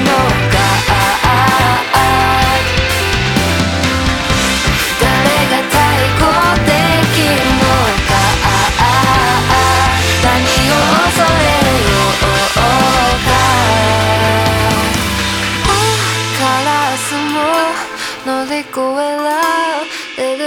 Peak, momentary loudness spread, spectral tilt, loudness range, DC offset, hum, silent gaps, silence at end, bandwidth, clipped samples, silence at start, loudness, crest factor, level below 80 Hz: 0 dBFS; 5 LU; -4 dB/octave; 4 LU; under 0.1%; none; none; 0 s; over 20 kHz; under 0.1%; 0 s; -11 LUFS; 12 dB; -26 dBFS